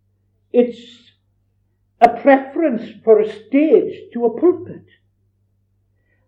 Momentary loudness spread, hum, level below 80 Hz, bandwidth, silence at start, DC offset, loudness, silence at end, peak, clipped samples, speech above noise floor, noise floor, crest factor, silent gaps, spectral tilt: 10 LU; none; -62 dBFS; 7.6 kHz; 0.55 s; under 0.1%; -16 LUFS; 1.5 s; 0 dBFS; under 0.1%; 48 dB; -64 dBFS; 18 dB; none; -7.5 dB/octave